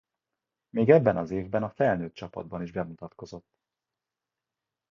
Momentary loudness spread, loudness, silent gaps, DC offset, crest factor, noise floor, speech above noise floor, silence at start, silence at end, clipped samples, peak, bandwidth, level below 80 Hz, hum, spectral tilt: 23 LU; -26 LUFS; none; under 0.1%; 24 dB; -89 dBFS; 62 dB; 0.75 s; 1.55 s; under 0.1%; -4 dBFS; 7 kHz; -58 dBFS; none; -9 dB/octave